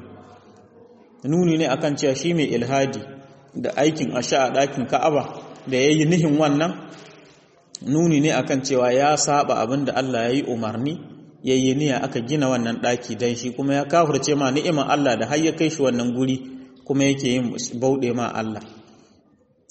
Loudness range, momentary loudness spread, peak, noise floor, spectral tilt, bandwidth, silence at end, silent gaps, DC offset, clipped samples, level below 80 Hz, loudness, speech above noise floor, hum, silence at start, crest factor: 3 LU; 11 LU; -6 dBFS; -59 dBFS; -5 dB/octave; 8.4 kHz; 0.9 s; none; under 0.1%; under 0.1%; -60 dBFS; -21 LUFS; 38 dB; none; 0 s; 16 dB